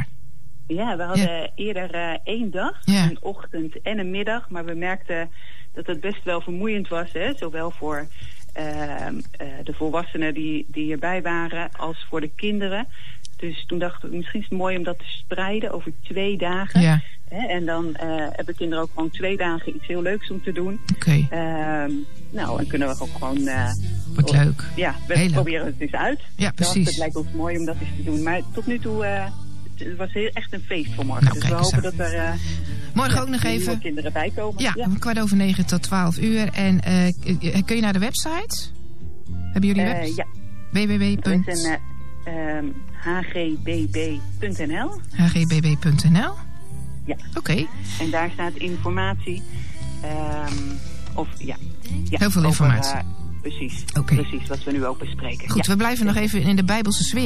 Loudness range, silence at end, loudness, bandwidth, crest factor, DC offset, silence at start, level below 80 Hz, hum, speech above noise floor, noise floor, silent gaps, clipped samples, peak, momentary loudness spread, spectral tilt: 7 LU; 0 s; -24 LUFS; 14.5 kHz; 18 dB; 7%; 0 s; -42 dBFS; none; 24 dB; -47 dBFS; none; under 0.1%; -4 dBFS; 13 LU; -5.5 dB/octave